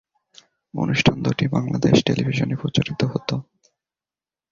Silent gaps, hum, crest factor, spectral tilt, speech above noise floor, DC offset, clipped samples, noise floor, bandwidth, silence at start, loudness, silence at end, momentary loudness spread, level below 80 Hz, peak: none; none; 22 dB; -6 dB/octave; over 70 dB; under 0.1%; under 0.1%; under -90 dBFS; 7.6 kHz; 0.75 s; -21 LUFS; 1.1 s; 10 LU; -50 dBFS; -2 dBFS